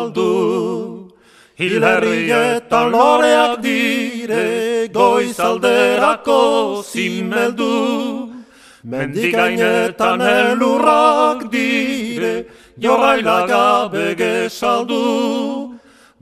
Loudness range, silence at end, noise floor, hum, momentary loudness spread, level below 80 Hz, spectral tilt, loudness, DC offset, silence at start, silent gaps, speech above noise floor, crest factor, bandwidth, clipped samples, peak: 3 LU; 0.45 s; -48 dBFS; none; 9 LU; -58 dBFS; -4.5 dB/octave; -15 LUFS; under 0.1%; 0 s; none; 33 dB; 16 dB; 14.5 kHz; under 0.1%; 0 dBFS